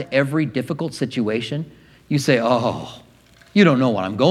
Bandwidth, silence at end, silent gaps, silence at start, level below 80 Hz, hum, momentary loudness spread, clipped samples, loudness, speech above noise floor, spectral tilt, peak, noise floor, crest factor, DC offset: 14 kHz; 0 s; none; 0 s; -58 dBFS; none; 13 LU; under 0.1%; -20 LUFS; 32 dB; -6 dB/octave; 0 dBFS; -51 dBFS; 20 dB; under 0.1%